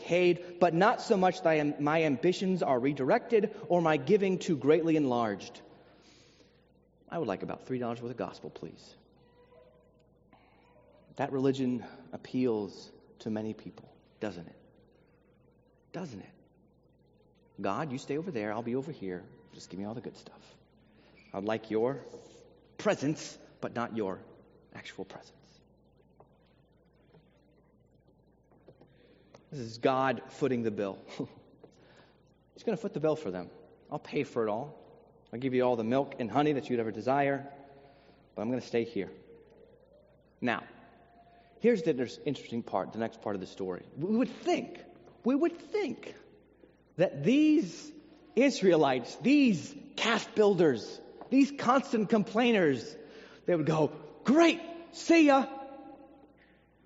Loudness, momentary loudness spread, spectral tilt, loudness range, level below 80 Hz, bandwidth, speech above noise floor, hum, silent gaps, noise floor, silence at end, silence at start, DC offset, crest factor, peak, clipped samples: -30 LUFS; 20 LU; -5 dB/octave; 14 LU; -72 dBFS; 7.6 kHz; 35 dB; none; none; -65 dBFS; 0.8 s; 0 s; under 0.1%; 22 dB; -10 dBFS; under 0.1%